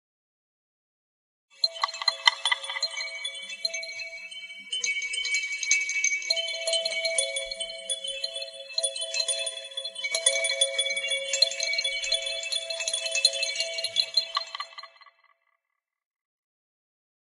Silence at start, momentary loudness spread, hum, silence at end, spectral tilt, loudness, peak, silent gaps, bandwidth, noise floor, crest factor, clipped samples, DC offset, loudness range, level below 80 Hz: 1.6 s; 11 LU; none; 2.2 s; 4.5 dB/octave; -26 LUFS; 0 dBFS; none; 15 kHz; -84 dBFS; 30 dB; under 0.1%; under 0.1%; 4 LU; -72 dBFS